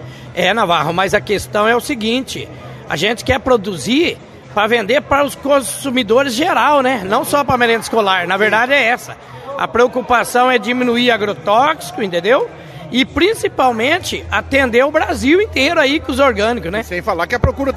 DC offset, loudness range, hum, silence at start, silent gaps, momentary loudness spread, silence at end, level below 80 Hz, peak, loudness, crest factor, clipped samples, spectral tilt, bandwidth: under 0.1%; 3 LU; none; 0 s; none; 8 LU; 0 s; -36 dBFS; 0 dBFS; -14 LUFS; 14 dB; under 0.1%; -4 dB/octave; 14 kHz